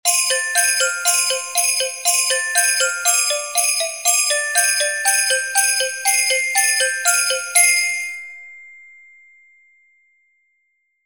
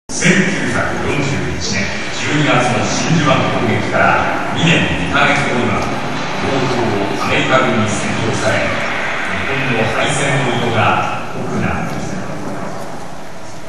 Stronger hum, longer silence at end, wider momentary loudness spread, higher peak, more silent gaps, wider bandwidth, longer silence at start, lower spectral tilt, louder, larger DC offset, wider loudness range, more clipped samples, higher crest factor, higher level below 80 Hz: neither; first, 2.25 s vs 0 s; second, 3 LU vs 11 LU; about the same, 0 dBFS vs 0 dBFS; neither; first, 17 kHz vs 12.5 kHz; about the same, 0.05 s vs 0.1 s; second, 5.5 dB/octave vs -4.5 dB/octave; about the same, -15 LUFS vs -15 LUFS; second, 0.1% vs 7%; about the same, 5 LU vs 3 LU; neither; about the same, 18 dB vs 16 dB; second, -72 dBFS vs -40 dBFS